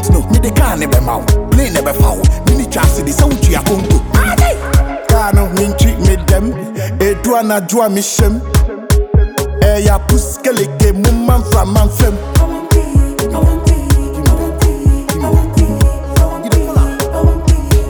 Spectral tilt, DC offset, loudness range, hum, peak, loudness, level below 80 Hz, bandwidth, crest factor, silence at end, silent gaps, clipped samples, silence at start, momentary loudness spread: -6 dB/octave; under 0.1%; 1 LU; none; 0 dBFS; -12 LUFS; -14 dBFS; over 20 kHz; 10 dB; 0 s; none; under 0.1%; 0 s; 3 LU